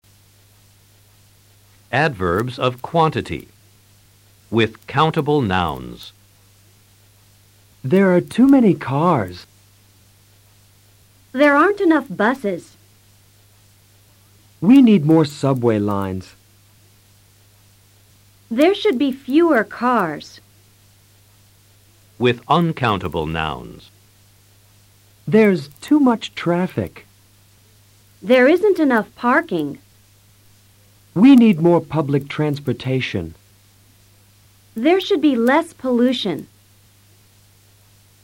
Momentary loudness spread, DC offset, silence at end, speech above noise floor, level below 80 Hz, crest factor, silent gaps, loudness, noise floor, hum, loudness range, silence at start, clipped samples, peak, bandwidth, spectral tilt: 17 LU; under 0.1%; 1.8 s; 36 dB; -52 dBFS; 16 dB; none; -17 LUFS; -52 dBFS; none; 5 LU; 1.9 s; under 0.1%; -4 dBFS; 16.5 kHz; -7 dB/octave